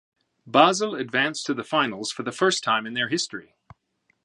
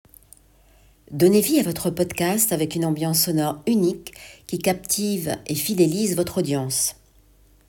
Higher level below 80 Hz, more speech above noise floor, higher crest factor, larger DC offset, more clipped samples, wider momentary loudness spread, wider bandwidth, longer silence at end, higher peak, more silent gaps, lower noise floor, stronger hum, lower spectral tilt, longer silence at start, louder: second, -70 dBFS vs -54 dBFS; first, 47 dB vs 33 dB; first, 24 dB vs 18 dB; neither; neither; first, 11 LU vs 8 LU; second, 11.5 kHz vs 19 kHz; about the same, 0.85 s vs 0.75 s; first, 0 dBFS vs -6 dBFS; neither; first, -70 dBFS vs -55 dBFS; neither; second, -3 dB/octave vs -4.5 dB/octave; second, 0.45 s vs 1.1 s; about the same, -23 LUFS vs -21 LUFS